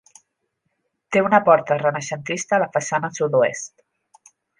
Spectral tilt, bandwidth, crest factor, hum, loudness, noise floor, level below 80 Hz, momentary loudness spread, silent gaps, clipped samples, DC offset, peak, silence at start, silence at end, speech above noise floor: -4.5 dB/octave; 10.5 kHz; 20 dB; none; -20 LUFS; -74 dBFS; -68 dBFS; 11 LU; none; under 0.1%; under 0.1%; -2 dBFS; 1.1 s; 0.95 s; 55 dB